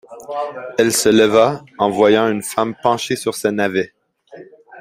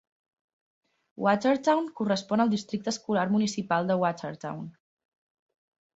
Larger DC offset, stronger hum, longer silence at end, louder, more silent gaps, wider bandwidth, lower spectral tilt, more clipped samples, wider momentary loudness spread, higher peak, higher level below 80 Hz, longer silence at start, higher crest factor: neither; neither; second, 0 s vs 1.25 s; first, -16 LUFS vs -27 LUFS; neither; first, 16 kHz vs 8 kHz; second, -4 dB/octave vs -5.5 dB/octave; neither; about the same, 13 LU vs 12 LU; first, 0 dBFS vs -10 dBFS; first, -58 dBFS vs -70 dBFS; second, 0.1 s vs 1.2 s; about the same, 16 dB vs 18 dB